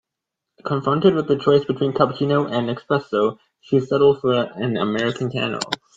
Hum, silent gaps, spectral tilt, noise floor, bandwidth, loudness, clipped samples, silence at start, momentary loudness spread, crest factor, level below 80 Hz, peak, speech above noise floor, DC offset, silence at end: none; none; -6.5 dB/octave; -83 dBFS; 9.2 kHz; -20 LUFS; under 0.1%; 0.65 s; 7 LU; 20 dB; -60 dBFS; 0 dBFS; 63 dB; under 0.1%; 0.2 s